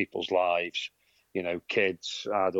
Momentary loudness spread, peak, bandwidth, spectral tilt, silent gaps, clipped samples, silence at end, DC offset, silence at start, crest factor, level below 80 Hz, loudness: 9 LU; -12 dBFS; 8 kHz; -4 dB/octave; none; under 0.1%; 0 s; under 0.1%; 0 s; 18 dB; -74 dBFS; -29 LUFS